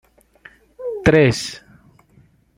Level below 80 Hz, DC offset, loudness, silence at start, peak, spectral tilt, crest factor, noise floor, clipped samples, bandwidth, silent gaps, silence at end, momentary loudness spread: -42 dBFS; under 0.1%; -17 LUFS; 0.8 s; -2 dBFS; -5.5 dB/octave; 20 dB; -54 dBFS; under 0.1%; 16 kHz; none; 1 s; 18 LU